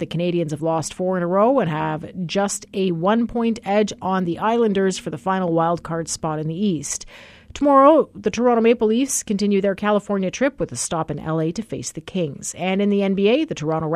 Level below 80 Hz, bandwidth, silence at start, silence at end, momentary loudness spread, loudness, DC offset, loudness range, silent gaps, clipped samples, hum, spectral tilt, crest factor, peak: -52 dBFS; 14 kHz; 0 s; 0 s; 9 LU; -20 LUFS; under 0.1%; 5 LU; none; under 0.1%; none; -5 dB/octave; 18 dB; -2 dBFS